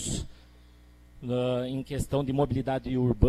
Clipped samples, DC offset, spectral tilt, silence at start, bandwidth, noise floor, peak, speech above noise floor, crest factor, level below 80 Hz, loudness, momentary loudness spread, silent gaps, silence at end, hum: under 0.1%; under 0.1%; -6.5 dB/octave; 0 s; 14 kHz; -54 dBFS; -6 dBFS; 27 dB; 24 dB; -44 dBFS; -30 LUFS; 8 LU; none; 0 s; 60 Hz at -50 dBFS